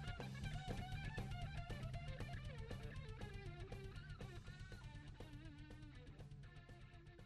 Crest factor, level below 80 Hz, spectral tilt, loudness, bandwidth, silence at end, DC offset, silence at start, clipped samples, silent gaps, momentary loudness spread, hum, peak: 18 dB; -56 dBFS; -6 dB/octave; -53 LUFS; 13 kHz; 0 s; under 0.1%; 0 s; under 0.1%; none; 10 LU; none; -34 dBFS